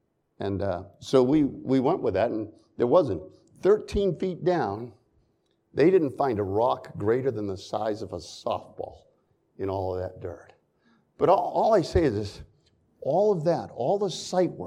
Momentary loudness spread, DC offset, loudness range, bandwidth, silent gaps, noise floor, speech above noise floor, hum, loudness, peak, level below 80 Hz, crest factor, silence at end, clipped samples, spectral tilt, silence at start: 13 LU; under 0.1%; 7 LU; 11 kHz; none; -70 dBFS; 45 dB; none; -26 LUFS; -6 dBFS; -50 dBFS; 20 dB; 0 s; under 0.1%; -7 dB/octave; 0.4 s